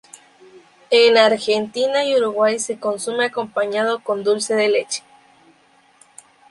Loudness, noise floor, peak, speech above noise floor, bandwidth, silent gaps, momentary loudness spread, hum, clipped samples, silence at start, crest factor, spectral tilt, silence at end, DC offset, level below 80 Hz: -18 LUFS; -55 dBFS; -2 dBFS; 37 dB; 11.5 kHz; none; 10 LU; none; under 0.1%; 0.55 s; 18 dB; -2 dB/octave; 1.5 s; under 0.1%; -68 dBFS